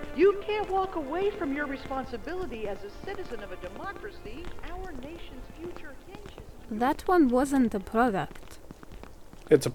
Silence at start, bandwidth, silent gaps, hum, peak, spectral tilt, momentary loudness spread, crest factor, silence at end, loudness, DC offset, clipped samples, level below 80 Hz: 0 s; 19 kHz; none; none; -6 dBFS; -6 dB/octave; 23 LU; 22 dB; 0 s; -29 LUFS; under 0.1%; under 0.1%; -46 dBFS